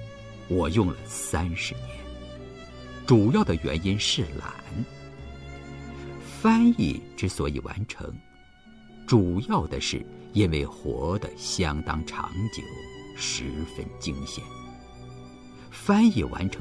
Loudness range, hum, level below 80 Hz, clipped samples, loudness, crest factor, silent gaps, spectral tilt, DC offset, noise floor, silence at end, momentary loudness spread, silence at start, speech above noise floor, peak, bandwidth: 5 LU; none; -42 dBFS; under 0.1%; -26 LUFS; 22 dB; none; -5.5 dB/octave; 0.1%; -53 dBFS; 0 s; 22 LU; 0 s; 27 dB; -6 dBFS; 11 kHz